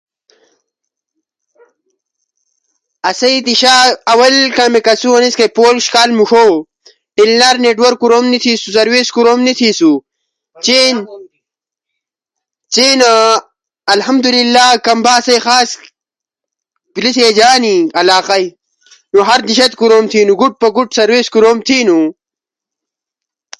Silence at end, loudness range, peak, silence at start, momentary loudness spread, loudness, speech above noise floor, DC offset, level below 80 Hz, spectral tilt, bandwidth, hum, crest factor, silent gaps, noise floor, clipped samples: 1.45 s; 4 LU; 0 dBFS; 3.05 s; 8 LU; -9 LUFS; 77 dB; under 0.1%; -58 dBFS; -2 dB/octave; 11.5 kHz; none; 12 dB; none; -86 dBFS; under 0.1%